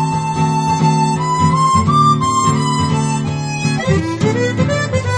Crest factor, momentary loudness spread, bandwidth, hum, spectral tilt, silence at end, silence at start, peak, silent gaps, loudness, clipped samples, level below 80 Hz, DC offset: 14 dB; 6 LU; 10.5 kHz; none; -5.5 dB/octave; 0 s; 0 s; 0 dBFS; none; -15 LUFS; under 0.1%; -40 dBFS; under 0.1%